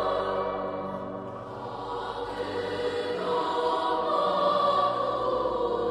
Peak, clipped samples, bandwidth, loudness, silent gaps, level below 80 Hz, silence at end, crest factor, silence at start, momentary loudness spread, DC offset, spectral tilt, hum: -14 dBFS; under 0.1%; 11.5 kHz; -28 LUFS; none; -56 dBFS; 0 s; 14 dB; 0 s; 12 LU; under 0.1%; -5.5 dB/octave; none